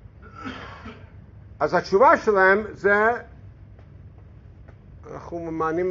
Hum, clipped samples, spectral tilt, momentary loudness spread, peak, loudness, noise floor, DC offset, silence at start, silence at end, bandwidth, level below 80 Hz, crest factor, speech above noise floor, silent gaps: none; under 0.1%; -4 dB/octave; 23 LU; -4 dBFS; -20 LUFS; -46 dBFS; under 0.1%; 0.2 s; 0 s; 7.4 kHz; -50 dBFS; 20 dB; 26 dB; none